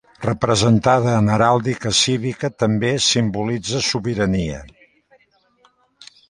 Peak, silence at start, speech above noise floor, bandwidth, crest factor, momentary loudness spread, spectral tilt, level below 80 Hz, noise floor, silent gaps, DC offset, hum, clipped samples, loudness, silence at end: -2 dBFS; 0.2 s; 41 dB; 11.5 kHz; 18 dB; 8 LU; -4.5 dB/octave; -44 dBFS; -58 dBFS; none; under 0.1%; none; under 0.1%; -18 LUFS; 1.65 s